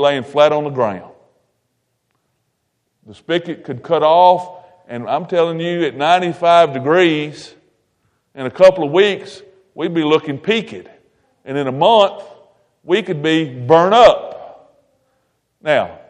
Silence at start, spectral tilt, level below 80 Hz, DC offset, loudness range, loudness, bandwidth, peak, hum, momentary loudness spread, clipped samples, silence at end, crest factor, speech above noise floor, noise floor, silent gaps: 0 s; -5.5 dB/octave; -56 dBFS; under 0.1%; 5 LU; -14 LUFS; 9.8 kHz; 0 dBFS; none; 17 LU; under 0.1%; 0.15 s; 16 dB; 55 dB; -69 dBFS; none